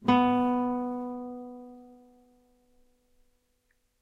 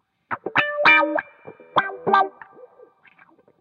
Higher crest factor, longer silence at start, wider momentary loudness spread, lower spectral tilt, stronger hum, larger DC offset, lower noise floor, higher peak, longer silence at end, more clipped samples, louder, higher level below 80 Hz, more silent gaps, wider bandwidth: about the same, 20 dB vs 20 dB; second, 0 s vs 0.3 s; first, 22 LU vs 13 LU; first, -7.5 dB/octave vs -5 dB/octave; neither; neither; first, -73 dBFS vs -55 dBFS; second, -10 dBFS vs -4 dBFS; first, 2.15 s vs 1.3 s; neither; second, -28 LUFS vs -19 LUFS; first, -64 dBFS vs -72 dBFS; neither; second, 5.8 kHz vs 8.4 kHz